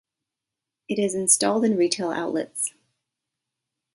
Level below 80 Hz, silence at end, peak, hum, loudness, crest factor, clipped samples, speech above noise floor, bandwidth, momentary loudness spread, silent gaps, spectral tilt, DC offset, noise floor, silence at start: -72 dBFS; 1.25 s; -4 dBFS; none; -23 LUFS; 22 dB; under 0.1%; 64 dB; 12 kHz; 10 LU; none; -3 dB/octave; under 0.1%; -87 dBFS; 0.9 s